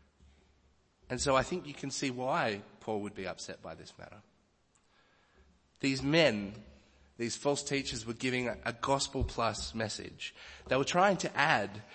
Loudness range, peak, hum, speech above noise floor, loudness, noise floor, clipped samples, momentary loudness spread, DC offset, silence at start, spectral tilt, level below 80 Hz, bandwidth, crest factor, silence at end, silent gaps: 7 LU; -10 dBFS; none; 38 dB; -33 LUFS; -71 dBFS; under 0.1%; 16 LU; under 0.1%; 1.1 s; -4 dB/octave; -54 dBFS; 8.8 kHz; 24 dB; 0 s; none